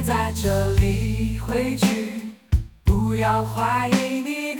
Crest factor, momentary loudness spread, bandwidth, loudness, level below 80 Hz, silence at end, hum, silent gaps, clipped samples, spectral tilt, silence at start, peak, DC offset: 16 dB; 5 LU; 19.5 kHz; -22 LUFS; -30 dBFS; 0 s; none; none; under 0.1%; -6 dB/octave; 0 s; -6 dBFS; under 0.1%